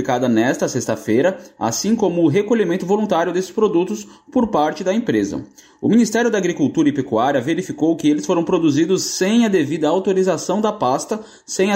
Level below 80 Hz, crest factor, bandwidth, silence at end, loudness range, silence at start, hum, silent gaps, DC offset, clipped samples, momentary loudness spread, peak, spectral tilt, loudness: -56 dBFS; 12 dB; 16 kHz; 0 s; 2 LU; 0 s; none; none; under 0.1%; under 0.1%; 6 LU; -6 dBFS; -5 dB/octave; -18 LUFS